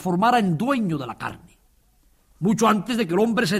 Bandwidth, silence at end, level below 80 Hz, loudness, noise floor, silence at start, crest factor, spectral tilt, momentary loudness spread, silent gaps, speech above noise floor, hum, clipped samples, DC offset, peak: 15.5 kHz; 0 s; -56 dBFS; -22 LUFS; -60 dBFS; 0 s; 16 dB; -5.5 dB/octave; 12 LU; none; 39 dB; none; under 0.1%; under 0.1%; -6 dBFS